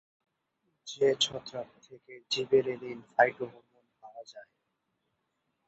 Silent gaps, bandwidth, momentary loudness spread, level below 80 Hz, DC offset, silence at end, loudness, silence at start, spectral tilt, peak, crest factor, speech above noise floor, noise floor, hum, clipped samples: none; 8.2 kHz; 23 LU; -76 dBFS; under 0.1%; 1.25 s; -29 LUFS; 0.85 s; -3 dB/octave; -8 dBFS; 24 dB; 50 dB; -81 dBFS; none; under 0.1%